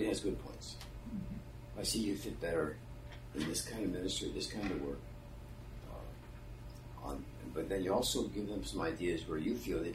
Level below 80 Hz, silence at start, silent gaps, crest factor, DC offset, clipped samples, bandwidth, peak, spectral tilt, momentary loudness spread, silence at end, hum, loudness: -52 dBFS; 0 s; none; 18 dB; under 0.1%; under 0.1%; 16 kHz; -22 dBFS; -4.5 dB/octave; 16 LU; 0 s; none; -40 LUFS